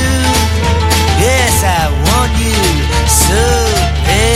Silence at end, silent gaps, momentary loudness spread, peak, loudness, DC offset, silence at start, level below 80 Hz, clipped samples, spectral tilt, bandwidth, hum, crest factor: 0 s; none; 3 LU; 0 dBFS; -11 LUFS; under 0.1%; 0 s; -16 dBFS; under 0.1%; -4 dB/octave; 16.5 kHz; none; 10 dB